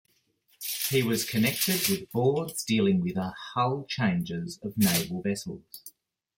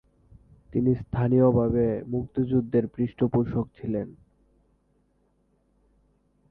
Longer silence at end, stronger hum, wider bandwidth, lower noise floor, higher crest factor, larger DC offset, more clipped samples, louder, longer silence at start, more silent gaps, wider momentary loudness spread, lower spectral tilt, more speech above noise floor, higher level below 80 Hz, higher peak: second, 0.5 s vs 2.4 s; second, none vs 50 Hz at -55 dBFS; first, 17 kHz vs 3.9 kHz; about the same, -68 dBFS vs -68 dBFS; about the same, 18 dB vs 18 dB; neither; neither; about the same, -27 LUFS vs -25 LUFS; about the same, 0.6 s vs 0.7 s; neither; about the same, 10 LU vs 11 LU; second, -4.5 dB/octave vs -12.5 dB/octave; second, 40 dB vs 44 dB; second, -64 dBFS vs -50 dBFS; about the same, -10 dBFS vs -10 dBFS